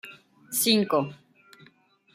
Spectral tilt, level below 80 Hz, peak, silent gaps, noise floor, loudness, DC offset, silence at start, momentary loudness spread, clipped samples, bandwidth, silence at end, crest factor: -3 dB/octave; -76 dBFS; -8 dBFS; none; -60 dBFS; -24 LUFS; under 0.1%; 0.05 s; 16 LU; under 0.1%; 16 kHz; 1 s; 20 dB